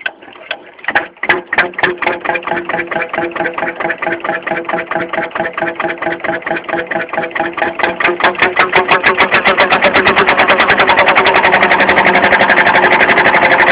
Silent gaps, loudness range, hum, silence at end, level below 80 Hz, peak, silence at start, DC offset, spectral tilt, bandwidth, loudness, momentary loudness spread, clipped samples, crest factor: none; 9 LU; none; 0 s; -44 dBFS; 0 dBFS; 0 s; under 0.1%; -7 dB/octave; 4 kHz; -11 LUFS; 10 LU; 0.3%; 12 dB